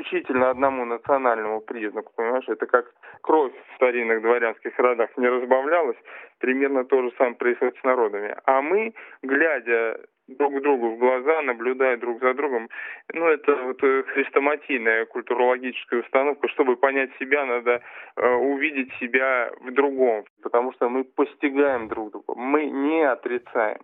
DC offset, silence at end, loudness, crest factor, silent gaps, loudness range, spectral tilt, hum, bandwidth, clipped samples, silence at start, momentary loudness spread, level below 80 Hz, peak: under 0.1%; 0.1 s; -23 LUFS; 20 dB; 20.30-20.36 s; 2 LU; -8.5 dB/octave; none; 3.9 kHz; under 0.1%; 0 s; 8 LU; -72 dBFS; -2 dBFS